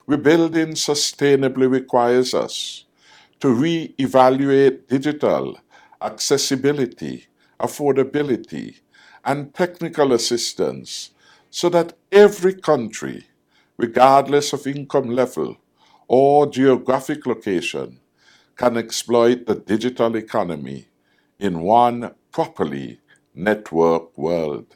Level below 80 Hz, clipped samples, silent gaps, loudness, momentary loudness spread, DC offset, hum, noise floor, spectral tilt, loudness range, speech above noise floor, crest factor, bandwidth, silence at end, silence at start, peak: -62 dBFS; under 0.1%; none; -19 LUFS; 16 LU; under 0.1%; none; -61 dBFS; -4.5 dB/octave; 5 LU; 43 dB; 18 dB; 16.5 kHz; 0.15 s; 0.1 s; 0 dBFS